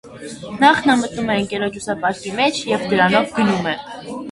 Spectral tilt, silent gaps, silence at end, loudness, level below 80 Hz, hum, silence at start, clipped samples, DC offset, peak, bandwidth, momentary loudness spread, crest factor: -4.5 dB/octave; none; 0 s; -18 LUFS; -52 dBFS; none; 0.05 s; under 0.1%; under 0.1%; 0 dBFS; 11.5 kHz; 16 LU; 18 dB